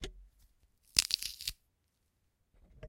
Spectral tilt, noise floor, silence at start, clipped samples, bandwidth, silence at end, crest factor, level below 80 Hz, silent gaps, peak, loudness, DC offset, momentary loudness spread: 0.5 dB/octave; -78 dBFS; 0 s; under 0.1%; 17 kHz; 0 s; 36 dB; -58 dBFS; none; -4 dBFS; -33 LUFS; under 0.1%; 13 LU